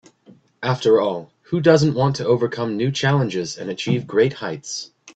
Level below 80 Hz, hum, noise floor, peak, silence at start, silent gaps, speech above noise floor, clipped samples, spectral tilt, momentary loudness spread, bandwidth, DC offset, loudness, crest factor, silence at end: -58 dBFS; none; -51 dBFS; -2 dBFS; 0.6 s; none; 32 dB; under 0.1%; -6 dB/octave; 12 LU; 8.4 kHz; under 0.1%; -20 LUFS; 18 dB; 0.05 s